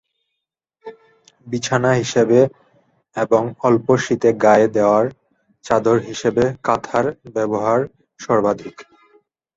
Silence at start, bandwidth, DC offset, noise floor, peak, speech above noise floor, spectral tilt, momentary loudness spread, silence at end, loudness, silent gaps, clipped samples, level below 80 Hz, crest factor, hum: 0.85 s; 8 kHz; under 0.1%; -80 dBFS; -2 dBFS; 63 dB; -6 dB/octave; 11 LU; 0.75 s; -18 LUFS; none; under 0.1%; -54 dBFS; 16 dB; none